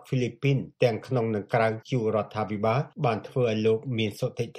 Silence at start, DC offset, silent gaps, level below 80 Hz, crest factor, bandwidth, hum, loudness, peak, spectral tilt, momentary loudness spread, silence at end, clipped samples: 0.05 s; under 0.1%; none; -66 dBFS; 18 dB; 14.5 kHz; none; -27 LUFS; -8 dBFS; -7 dB/octave; 4 LU; 0 s; under 0.1%